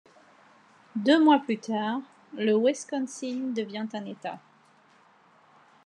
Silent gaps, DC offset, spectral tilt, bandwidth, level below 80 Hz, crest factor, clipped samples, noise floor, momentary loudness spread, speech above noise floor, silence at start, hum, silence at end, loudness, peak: none; under 0.1%; -4.5 dB/octave; 10 kHz; under -90 dBFS; 20 dB; under 0.1%; -60 dBFS; 17 LU; 34 dB; 0.95 s; none; 1.45 s; -27 LUFS; -8 dBFS